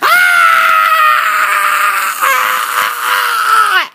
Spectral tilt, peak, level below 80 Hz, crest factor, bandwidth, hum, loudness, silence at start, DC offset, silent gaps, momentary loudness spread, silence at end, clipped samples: 2 dB/octave; 0 dBFS; -66 dBFS; 10 dB; 16 kHz; none; -9 LUFS; 0 s; under 0.1%; none; 6 LU; 0.05 s; under 0.1%